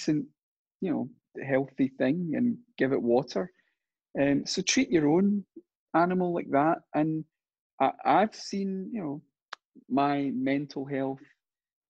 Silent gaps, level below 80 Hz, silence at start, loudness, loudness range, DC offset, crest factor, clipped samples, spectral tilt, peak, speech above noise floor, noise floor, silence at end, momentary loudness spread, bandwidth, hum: 0.43-0.80 s, 5.75-5.87 s, 7.59-7.78 s, 9.42-9.46 s, 9.65-9.70 s; -68 dBFS; 0 s; -28 LUFS; 4 LU; under 0.1%; 18 dB; under 0.1%; -5.5 dB/octave; -10 dBFS; 53 dB; -80 dBFS; 0.7 s; 15 LU; 8.6 kHz; none